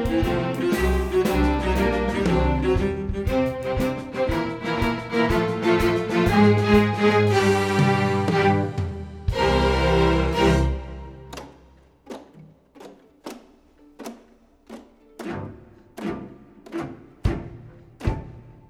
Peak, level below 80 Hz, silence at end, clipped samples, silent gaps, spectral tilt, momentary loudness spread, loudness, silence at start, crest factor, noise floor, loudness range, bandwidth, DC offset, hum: -4 dBFS; -32 dBFS; 0.2 s; under 0.1%; none; -6.5 dB/octave; 21 LU; -22 LUFS; 0 s; 18 dB; -54 dBFS; 21 LU; 17.5 kHz; under 0.1%; none